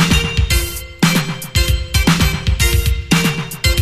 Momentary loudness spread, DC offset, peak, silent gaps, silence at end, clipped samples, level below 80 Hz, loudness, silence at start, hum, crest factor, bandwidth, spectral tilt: 4 LU; under 0.1%; 0 dBFS; none; 0 s; under 0.1%; -20 dBFS; -16 LUFS; 0 s; none; 14 dB; 15.5 kHz; -4 dB/octave